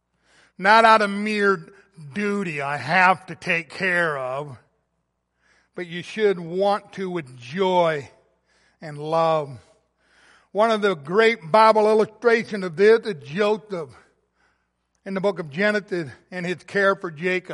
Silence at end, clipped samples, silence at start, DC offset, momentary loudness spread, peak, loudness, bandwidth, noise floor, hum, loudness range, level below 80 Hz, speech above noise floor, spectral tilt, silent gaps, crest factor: 0 s; under 0.1%; 0.6 s; under 0.1%; 17 LU; -2 dBFS; -21 LUFS; 11.5 kHz; -74 dBFS; none; 8 LU; -70 dBFS; 53 dB; -5.5 dB/octave; none; 20 dB